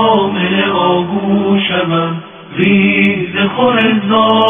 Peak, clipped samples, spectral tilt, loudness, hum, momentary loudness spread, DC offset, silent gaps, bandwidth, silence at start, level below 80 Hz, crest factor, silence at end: 0 dBFS; under 0.1%; -8.5 dB/octave; -12 LUFS; none; 5 LU; under 0.1%; none; 3.7 kHz; 0 s; -54 dBFS; 12 dB; 0 s